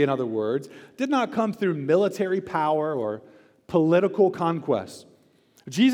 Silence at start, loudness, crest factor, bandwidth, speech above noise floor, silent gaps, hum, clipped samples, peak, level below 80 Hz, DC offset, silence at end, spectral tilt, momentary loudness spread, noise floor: 0 s; -24 LUFS; 16 dB; 15.5 kHz; 36 dB; none; none; under 0.1%; -8 dBFS; -70 dBFS; under 0.1%; 0 s; -6.5 dB/octave; 11 LU; -60 dBFS